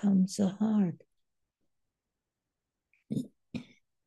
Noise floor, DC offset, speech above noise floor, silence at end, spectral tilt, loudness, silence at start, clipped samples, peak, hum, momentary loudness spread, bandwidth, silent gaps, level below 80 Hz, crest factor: -88 dBFS; under 0.1%; 60 dB; 0.45 s; -7 dB/octave; -31 LUFS; 0 s; under 0.1%; -18 dBFS; none; 17 LU; 12 kHz; none; -78 dBFS; 16 dB